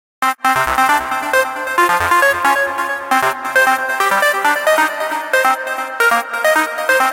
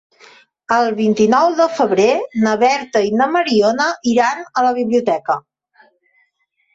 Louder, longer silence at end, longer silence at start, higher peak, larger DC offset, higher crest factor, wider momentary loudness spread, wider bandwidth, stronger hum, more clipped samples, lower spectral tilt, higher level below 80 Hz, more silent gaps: about the same, -14 LUFS vs -15 LUFS; second, 0 s vs 1.35 s; second, 0.2 s vs 0.7 s; about the same, -2 dBFS vs -2 dBFS; neither; about the same, 12 dB vs 14 dB; about the same, 5 LU vs 5 LU; first, 17 kHz vs 7.8 kHz; neither; neither; second, -1.5 dB/octave vs -4.5 dB/octave; first, -48 dBFS vs -60 dBFS; neither